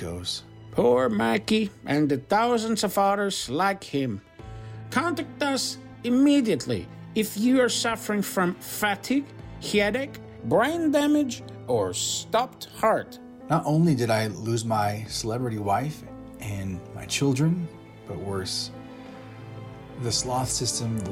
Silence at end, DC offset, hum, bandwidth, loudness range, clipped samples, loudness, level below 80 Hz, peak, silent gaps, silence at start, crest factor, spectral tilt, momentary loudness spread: 0 s; under 0.1%; none; 16.5 kHz; 5 LU; under 0.1%; -25 LUFS; -54 dBFS; -10 dBFS; none; 0 s; 16 dB; -4.5 dB/octave; 17 LU